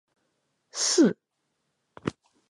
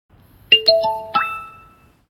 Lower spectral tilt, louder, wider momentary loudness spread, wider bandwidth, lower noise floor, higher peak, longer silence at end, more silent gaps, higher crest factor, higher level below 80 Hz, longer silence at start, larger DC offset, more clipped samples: about the same, -3.5 dB/octave vs -2.5 dB/octave; second, -25 LUFS vs -16 LUFS; first, 17 LU vs 13 LU; second, 11.5 kHz vs 16 kHz; first, -78 dBFS vs -50 dBFS; second, -10 dBFS vs 0 dBFS; second, 0.4 s vs 0.6 s; neither; about the same, 20 dB vs 20 dB; second, -64 dBFS vs -56 dBFS; first, 0.75 s vs 0.5 s; neither; neither